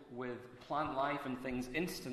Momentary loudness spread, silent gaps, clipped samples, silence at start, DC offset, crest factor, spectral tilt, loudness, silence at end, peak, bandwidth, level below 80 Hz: 8 LU; none; under 0.1%; 0 s; under 0.1%; 18 dB; -5 dB/octave; -40 LUFS; 0 s; -22 dBFS; 14 kHz; -64 dBFS